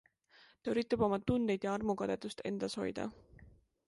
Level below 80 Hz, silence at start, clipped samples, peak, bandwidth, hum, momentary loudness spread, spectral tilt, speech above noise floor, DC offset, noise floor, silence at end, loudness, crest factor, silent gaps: -62 dBFS; 0.65 s; under 0.1%; -18 dBFS; 11.5 kHz; none; 9 LU; -6 dB/octave; 30 dB; under 0.1%; -66 dBFS; 0.4 s; -36 LUFS; 20 dB; none